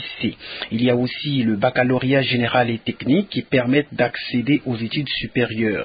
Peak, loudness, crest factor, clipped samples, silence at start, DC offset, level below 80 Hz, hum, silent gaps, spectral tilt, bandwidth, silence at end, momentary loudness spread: -4 dBFS; -20 LUFS; 16 dB; under 0.1%; 0 s; under 0.1%; -52 dBFS; none; none; -11.5 dB/octave; 5 kHz; 0 s; 7 LU